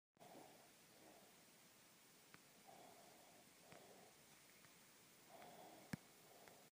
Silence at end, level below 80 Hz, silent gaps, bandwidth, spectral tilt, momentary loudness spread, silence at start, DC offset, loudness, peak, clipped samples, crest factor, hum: 0 s; under -90 dBFS; none; 15.5 kHz; -3.5 dB/octave; 10 LU; 0.15 s; under 0.1%; -64 LUFS; -34 dBFS; under 0.1%; 32 dB; none